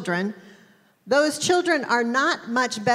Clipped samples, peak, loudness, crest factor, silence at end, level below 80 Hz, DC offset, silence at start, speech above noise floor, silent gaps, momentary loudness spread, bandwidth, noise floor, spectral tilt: under 0.1%; -8 dBFS; -22 LUFS; 16 dB; 0 s; -74 dBFS; under 0.1%; 0 s; 34 dB; none; 6 LU; 16 kHz; -56 dBFS; -3.5 dB/octave